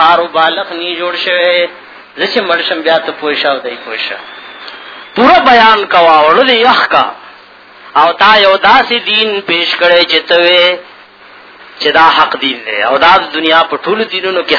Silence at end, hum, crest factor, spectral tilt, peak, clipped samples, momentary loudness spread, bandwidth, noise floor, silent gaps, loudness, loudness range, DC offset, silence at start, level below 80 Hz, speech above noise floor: 0 s; none; 10 dB; -4 dB/octave; 0 dBFS; 2%; 12 LU; 5.4 kHz; -36 dBFS; none; -8 LUFS; 5 LU; under 0.1%; 0 s; -50 dBFS; 28 dB